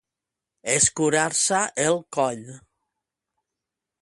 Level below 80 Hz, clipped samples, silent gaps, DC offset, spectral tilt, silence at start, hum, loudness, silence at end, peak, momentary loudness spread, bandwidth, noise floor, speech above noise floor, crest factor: -62 dBFS; under 0.1%; none; under 0.1%; -2.5 dB/octave; 0.65 s; none; -21 LUFS; 1.45 s; -4 dBFS; 8 LU; 11.5 kHz; -87 dBFS; 64 dB; 22 dB